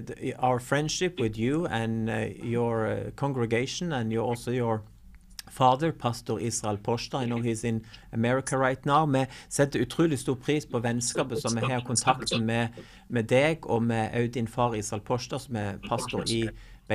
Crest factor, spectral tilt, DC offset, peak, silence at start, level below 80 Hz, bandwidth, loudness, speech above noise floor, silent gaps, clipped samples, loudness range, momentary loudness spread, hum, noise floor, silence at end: 20 dB; -5 dB/octave; under 0.1%; -8 dBFS; 0 s; -52 dBFS; 15 kHz; -28 LUFS; 19 dB; none; under 0.1%; 2 LU; 8 LU; none; -47 dBFS; 0 s